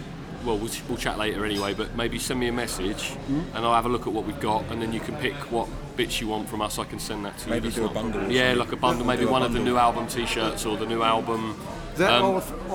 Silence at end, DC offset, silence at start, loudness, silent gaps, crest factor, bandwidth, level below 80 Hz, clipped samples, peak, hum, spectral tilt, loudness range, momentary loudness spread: 0 s; under 0.1%; 0 s; -26 LUFS; none; 22 dB; over 20 kHz; -42 dBFS; under 0.1%; -4 dBFS; none; -4.5 dB/octave; 5 LU; 9 LU